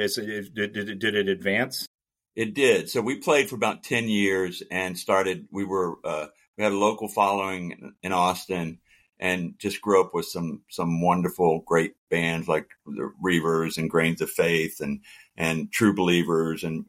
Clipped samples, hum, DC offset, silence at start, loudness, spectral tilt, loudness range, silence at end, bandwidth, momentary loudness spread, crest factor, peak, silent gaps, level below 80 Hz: under 0.1%; none; under 0.1%; 0 s; -25 LUFS; -5 dB/octave; 2 LU; 0.05 s; 16.5 kHz; 11 LU; 18 dB; -6 dBFS; 1.87-1.99 s, 6.48-6.53 s, 11.98-12.07 s; -60 dBFS